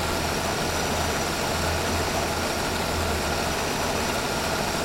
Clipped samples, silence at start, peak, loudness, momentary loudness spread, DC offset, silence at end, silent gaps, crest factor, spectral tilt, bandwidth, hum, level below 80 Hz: under 0.1%; 0 s; -12 dBFS; -25 LUFS; 1 LU; under 0.1%; 0 s; none; 12 dB; -3.5 dB/octave; 16.5 kHz; none; -40 dBFS